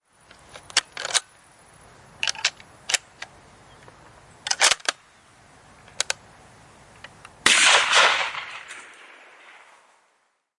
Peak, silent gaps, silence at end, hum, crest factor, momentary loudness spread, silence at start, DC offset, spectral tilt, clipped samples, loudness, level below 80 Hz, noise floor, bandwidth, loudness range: -2 dBFS; none; 1.75 s; none; 24 dB; 25 LU; 0.55 s; under 0.1%; 1.5 dB/octave; under 0.1%; -20 LUFS; -64 dBFS; -69 dBFS; 11.5 kHz; 8 LU